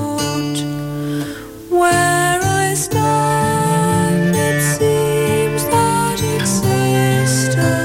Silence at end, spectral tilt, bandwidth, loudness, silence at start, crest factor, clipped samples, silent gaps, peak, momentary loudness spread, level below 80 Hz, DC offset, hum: 0 s; -5 dB/octave; 17 kHz; -16 LUFS; 0 s; 10 dB; under 0.1%; none; -6 dBFS; 8 LU; -42 dBFS; under 0.1%; none